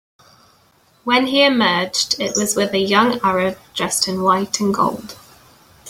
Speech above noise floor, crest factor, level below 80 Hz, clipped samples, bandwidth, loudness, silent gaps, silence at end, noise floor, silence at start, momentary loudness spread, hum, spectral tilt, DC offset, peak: 38 dB; 18 dB; -56 dBFS; under 0.1%; 16.5 kHz; -17 LUFS; none; 0 s; -55 dBFS; 1.05 s; 8 LU; none; -3 dB/octave; under 0.1%; -2 dBFS